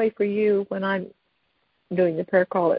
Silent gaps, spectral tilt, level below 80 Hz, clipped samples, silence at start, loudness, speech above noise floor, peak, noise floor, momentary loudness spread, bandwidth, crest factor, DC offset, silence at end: none; -11.5 dB/octave; -68 dBFS; under 0.1%; 0 s; -23 LUFS; 48 dB; -8 dBFS; -71 dBFS; 8 LU; 5.2 kHz; 16 dB; under 0.1%; 0 s